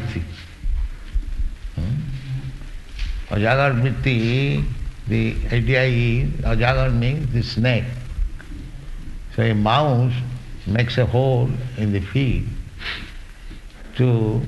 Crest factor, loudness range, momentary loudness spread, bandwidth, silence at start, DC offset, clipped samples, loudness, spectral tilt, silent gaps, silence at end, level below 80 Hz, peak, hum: 18 dB; 3 LU; 19 LU; 8.8 kHz; 0 s; under 0.1%; under 0.1%; -21 LUFS; -7.5 dB/octave; none; 0 s; -28 dBFS; -2 dBFS; none